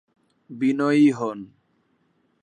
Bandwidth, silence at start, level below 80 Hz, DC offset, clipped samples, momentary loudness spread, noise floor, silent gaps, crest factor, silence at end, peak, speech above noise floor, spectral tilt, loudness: 9.8 kHz; 0.5 s; -74 dBFS; under 0.1%; under 0.1%; 20 LU; -67 dBFS; none; 16 dB; 1 s; -8 dBFS; 46 dB; -7 dB/octave; -21 LUFS